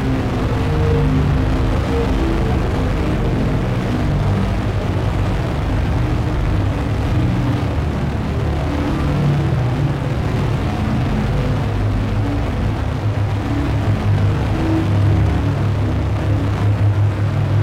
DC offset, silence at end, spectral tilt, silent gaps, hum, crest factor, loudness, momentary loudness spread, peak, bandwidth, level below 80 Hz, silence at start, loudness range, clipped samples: under 0.1%; 0 s; -8 dB/octave; none; none; 10 dB; -18 LUFS; 4 LU; -6 dBFS; 11 kHz; -24 dBFS; 0 s; 2 LU; under 0.1%